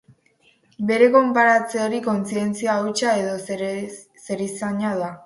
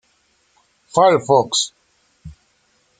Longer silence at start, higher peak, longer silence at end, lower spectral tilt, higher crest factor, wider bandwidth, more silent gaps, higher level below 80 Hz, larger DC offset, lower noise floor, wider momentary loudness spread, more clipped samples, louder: second, 0.8 s vs 0.95 s; about the same, -2 dBFS vs -2 dBFS; second, 0.05 s vs 0.7 s; first, -5 dB/octave vs -3.5 dB/octave; about the same, 18 dB vs 18 dB; first, 11.5 kHz vs 9.6 kHz; neither; second, -68 dBFS vs -56 dBFS; neither; about the same, -60 dBFS vs -62 dBFS; first, 13 LU vs 9 LU; neither; second, -21 LUFS vs -16 LUFS